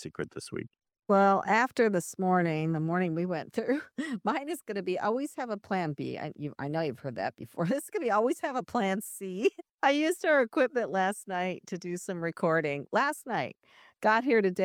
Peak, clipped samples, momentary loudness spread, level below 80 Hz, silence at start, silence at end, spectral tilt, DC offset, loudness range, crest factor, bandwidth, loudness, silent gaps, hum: -12 dBFS; under 0.1%; 12 LU; -74 dBFS; 0 s; 0 s; -5.5 dB/octave; under 0.1%; 5 LU; 18 dB; 17 kHz; -30 LUFS; 9.74-9.78 s; none